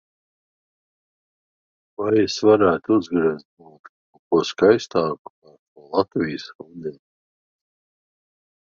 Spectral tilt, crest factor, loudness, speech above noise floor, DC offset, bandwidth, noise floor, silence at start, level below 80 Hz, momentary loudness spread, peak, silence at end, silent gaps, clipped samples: -5.5 dB/octave; 22 dB; -20 LUFS; over 70 dB; under 0.1%; 7.4 kHz; under -90 dBFS; 2 s; -60 dBFS; 18 LU; -2 dBFS; 1.8 s; 3.45-3.57 s, 3.79-4.13 s, 4.19-4.31 s, 5.19-5.42 s, 5.59-5.76 s, 6.55-6.59 s; under 0.1%